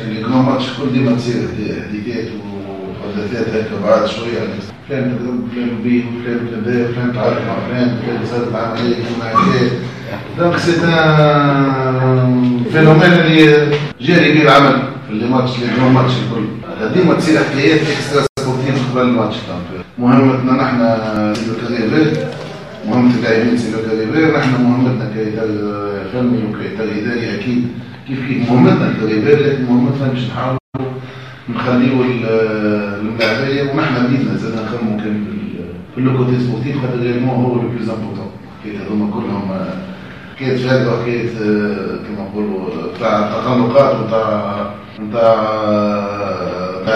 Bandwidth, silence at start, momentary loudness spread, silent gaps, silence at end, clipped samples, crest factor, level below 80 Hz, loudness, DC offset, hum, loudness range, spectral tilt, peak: 11 kHz; 0 s; 13 LU; 18.29-18.36 s, 30.60-30.73 s; 0 s; under 0.1%; 14 dB; -48 dBFS; -15 LUFS; 0.4%; none; 8 LU; -7 dB/octave; 0 dBFS